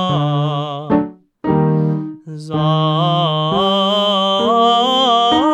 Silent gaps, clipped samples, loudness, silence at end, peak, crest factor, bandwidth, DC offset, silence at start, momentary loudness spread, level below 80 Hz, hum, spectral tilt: none; under 0.1%; -15 LUFS; 0 s; -2 dBFS; 14 dB; 8.6 kHz; under 0.1%; 0 s; 11 LU; -50 dBFS; none; -6.5 dB/octave